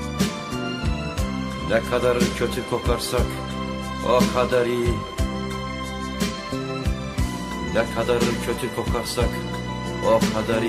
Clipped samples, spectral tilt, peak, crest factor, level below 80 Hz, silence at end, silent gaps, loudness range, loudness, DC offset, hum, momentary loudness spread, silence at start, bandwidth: under 0.1%; -5.5 dB/octave; -6 dBFS; 18 dB; -34 dBFS; 0 s; none; 3 LU; -24 LUFS; under 0.1%; none; 9 LU; 0 s; 15 kHz